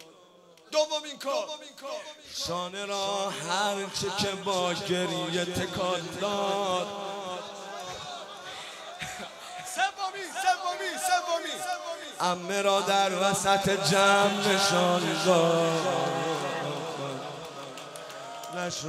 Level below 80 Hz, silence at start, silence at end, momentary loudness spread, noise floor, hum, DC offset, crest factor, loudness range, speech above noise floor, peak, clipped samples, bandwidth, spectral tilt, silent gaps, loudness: -64 dBFS; 0 s; 0 s; 16 LU; -56 dBFS; none; under 0.1%; 20 dB; 9 LU; 28 dB; -10 dBFS; under 0.1%; 16 kHz; -3 dB/octave; none; -28 LUFS